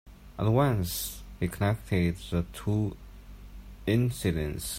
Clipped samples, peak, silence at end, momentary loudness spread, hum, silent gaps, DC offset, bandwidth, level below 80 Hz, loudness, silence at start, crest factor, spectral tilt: under 0.1%; -12 dBFS; 0 s; 23 LU; none; none; under 0.1%; 16 kHz; -46 dBFS; -29 LUFS; 0.05 s; 18 dB; -6 dB/octave